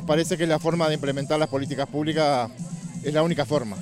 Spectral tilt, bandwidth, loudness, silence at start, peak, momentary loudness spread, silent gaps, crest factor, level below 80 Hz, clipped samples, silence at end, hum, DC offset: -5.5 dB/octave; 15.5 kHz; -24 LUFS; 0 s; -8 dBFS; 8 LU; none; 16 dB; -58 dBFS; under 0.1%; 0 s; none; under 0.1%